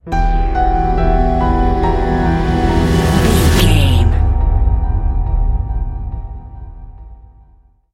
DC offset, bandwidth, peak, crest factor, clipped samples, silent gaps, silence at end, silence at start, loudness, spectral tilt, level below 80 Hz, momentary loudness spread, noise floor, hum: under 0.1%; 16 kHz; 0 dBFS; 14 dB; under 0.1%; none; 0.8 s; 0.05 s; -15 LUFS; -6 dB/octave; -16 dBFS; 15 LU; -48 dBFS; none